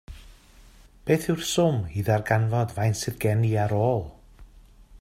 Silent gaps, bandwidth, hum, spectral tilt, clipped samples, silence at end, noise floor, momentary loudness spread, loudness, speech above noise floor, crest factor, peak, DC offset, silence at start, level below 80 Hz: none; 15.5 kHz; none; -6 dB/octave; under 0.1%; 0.05 s; -51 dBFS; 5 LU; -25 LUFS; 28 dB; 20 dB; -6 dBFS; under 0.1%; 0.1 s; -48 dBFS